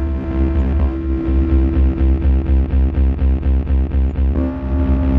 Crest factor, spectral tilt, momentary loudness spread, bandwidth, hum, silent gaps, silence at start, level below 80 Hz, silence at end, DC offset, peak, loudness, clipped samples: 10 dB; -11 dB/octave; 4 LU; 3.5 kHz; none; none; 0 s; -16 dBFS; 0 s; under 0.1%; -6 dBFS; -17 LUFS; under 0.1%